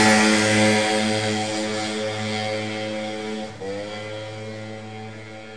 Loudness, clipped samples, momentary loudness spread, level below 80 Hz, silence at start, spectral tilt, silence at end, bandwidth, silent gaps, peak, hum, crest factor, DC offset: -22 LUFS; under 0.1%; 18 LU; -58 dBFS; 0 s; -3.5 dB/octave; 0 s; 11 kHz; none; -6 dBFS; none; 18 dB; 0.4%